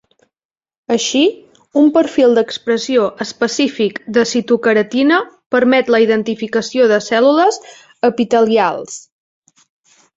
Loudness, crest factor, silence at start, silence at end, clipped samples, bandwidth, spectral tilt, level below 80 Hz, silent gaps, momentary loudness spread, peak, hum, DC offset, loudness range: -14 LUFS; 14 dB; 0.9 s; 1.15 s; under 0.1%; 8 kHz; -4 dB/octave; -60 dBFS; 5.46-5.50 s; 7 LU; -2 dBFS; none; under 0.1%; 2 LU